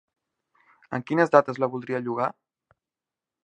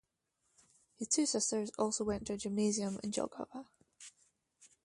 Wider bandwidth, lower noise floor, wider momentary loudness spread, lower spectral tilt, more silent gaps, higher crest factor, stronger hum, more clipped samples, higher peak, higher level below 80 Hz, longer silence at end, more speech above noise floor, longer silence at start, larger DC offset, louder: second, 8.8 kHz vs 11.5 kHz; first, -90 dBFS vs -82 dBFS; second, 12 LU vs 22 LU; first, -7.5 dB/octave vs -3.5 dB/octave; neither; about the same, 26 dB vs 22 dB; neither; neither; first, 0 dBFS vs -18 dBFS; second, -74 dBFS vs -66 dBFS; first, 1.15 s vs 0.2 s; first, 66 dB vs 46 dB; about the same, 0.9 s vs 1 s; neither; first, -25 LUFS vs -36 LUFS